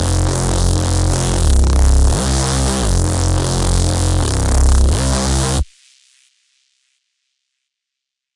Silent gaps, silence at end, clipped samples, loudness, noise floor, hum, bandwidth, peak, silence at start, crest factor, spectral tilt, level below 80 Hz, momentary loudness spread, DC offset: none; 2.75 s; under 0.1%; -15 LUFS; -82 dBFS; none; 11.5 kHz; -2 dBFS; 0 s; 14 dB; -4.5 dB/octave; -18 dBFS; 3 LU; under 0.1%